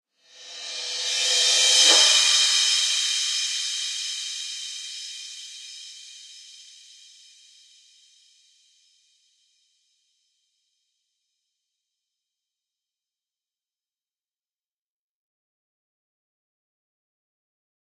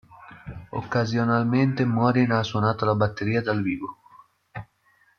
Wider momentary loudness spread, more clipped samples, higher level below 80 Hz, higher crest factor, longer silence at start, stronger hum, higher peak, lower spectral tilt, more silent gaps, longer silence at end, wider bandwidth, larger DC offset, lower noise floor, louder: first, 25 LU vs 20 LU; neither; second, under -90 dBFS vs -56 dBFS; first, 26 dB vs 18 dB; first, 0.4 s vs 0.1 s; neither; first, -2 dBFS vs -8 dBFS; second, 5.5 dB/octave vs -7.5 dB/octave; neither; first, 11.35 s vs 0.55 s; first, 15 kHz vs 6.8 kHz; neither; first, under -90 dBFS vs -63 dBFS; first, -19 LUFS vs -24 LUFS